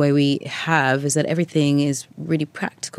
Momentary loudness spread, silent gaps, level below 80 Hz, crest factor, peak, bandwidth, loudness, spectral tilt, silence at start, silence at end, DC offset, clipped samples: 8 LU; none; -68 dBFS; 18 dB; -2 dBFS; 13.5 kHz; -21 LUFS; -5 dB/octave; 0 s; 0 s; under 0.1%; under 0.1%